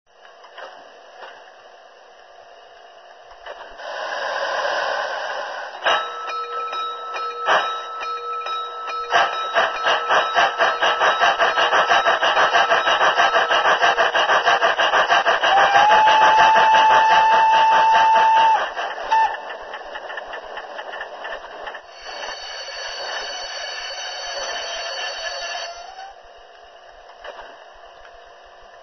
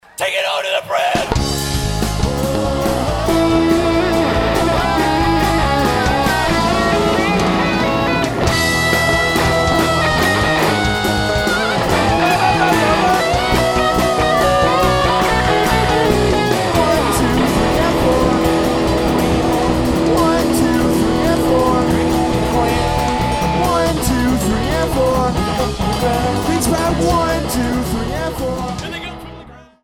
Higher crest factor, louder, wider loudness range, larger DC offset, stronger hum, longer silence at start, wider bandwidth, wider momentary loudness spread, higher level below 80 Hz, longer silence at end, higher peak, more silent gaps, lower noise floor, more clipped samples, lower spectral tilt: first, 20 dB vs 14 dB; second, -18 LUFS vs -15 LUFS; first, 17 LU vs 3 LU; neither; neither; first, 0.45 s vs 0.2 s; second, 6.4 kHz vs 18.5 kHz; first, 19 LU vs 5 LU; second, -58 dBFS vs -26 dBFS; first, 0.75 s vs 0.2 s; about the same, 0 dBFS vs -2 dBFS; neither; first, -46 dBFS vs -38 dBFS; neither; second, -0.5 dB/octave vs -5 dB/octave